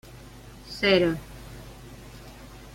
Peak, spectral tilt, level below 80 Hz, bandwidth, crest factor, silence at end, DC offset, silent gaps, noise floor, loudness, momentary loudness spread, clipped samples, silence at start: -6 dBFS; -5.5 dB/octave; -48 dBFS; 16.5 kHz; 22 dB; 0.05 s; under 0.1%; none; -46 dBFS; -24 LUFS; 25 LU; under 0.1%; 0.15 s